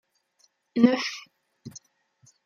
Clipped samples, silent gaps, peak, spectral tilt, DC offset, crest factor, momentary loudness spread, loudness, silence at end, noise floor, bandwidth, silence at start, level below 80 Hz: under 0.1%; none; -6 dBFS; -5 dB/octave; under 0.1%; 24 dB; 24 LU; -24 LUFS; 0.7 s; -68 dBFS; 7.2 kHz; 0.75 s; -78 dBFS